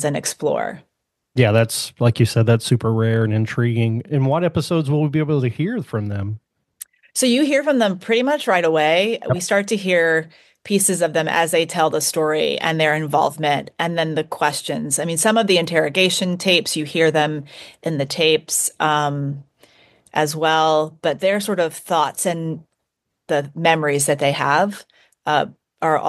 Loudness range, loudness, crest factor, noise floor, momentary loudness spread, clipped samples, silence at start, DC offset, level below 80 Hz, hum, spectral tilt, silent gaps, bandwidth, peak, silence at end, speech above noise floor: 3 LU; -19 LUFS; 18 dB; -77 dBFS; 9 LU; under 0.1%; 0 s; under 0.1%; -60 dBFS; none; -4.5 dB/octave; none; 12.5 kHz; -2 dBFS; 0 s; 58 dB